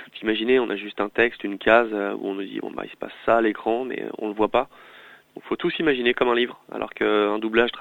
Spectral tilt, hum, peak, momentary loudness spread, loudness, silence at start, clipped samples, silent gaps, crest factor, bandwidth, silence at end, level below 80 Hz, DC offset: -6.5 dB/octave; none; -2 dBFS; 12 LU; -23 LUFS; 0 s; under 0.1%; none; 22 dB; 17 kHz; 0 s; -56 dBFS; under 0.1%